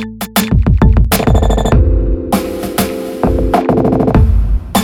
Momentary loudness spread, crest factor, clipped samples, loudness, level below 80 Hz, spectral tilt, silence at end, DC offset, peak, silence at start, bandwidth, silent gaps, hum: 6 LU; 10 dB; under 0.1%; -13 LUFS; -14 dBFS; -6.5 dB/octave; 0 s; under 0.1%; 0 dBFS; 0 s; 18.5 kHz; none; none